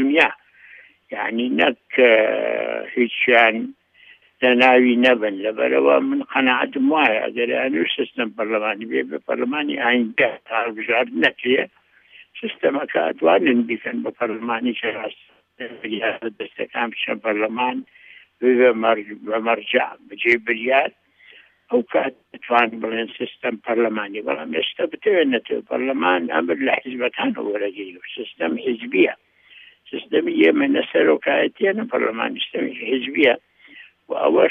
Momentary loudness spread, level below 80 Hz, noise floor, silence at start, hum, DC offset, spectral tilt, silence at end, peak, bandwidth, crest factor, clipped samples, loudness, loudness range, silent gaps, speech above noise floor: 12 LU; -74 dBFS; -51 dBFS; 0 s; none; under 0.1%; -6 dB/octave; 0 s; -2 dBFS; 6.4 kHz; 20 dB; under 0.1%; -20 LUFS; 6 LU; none; 31 dB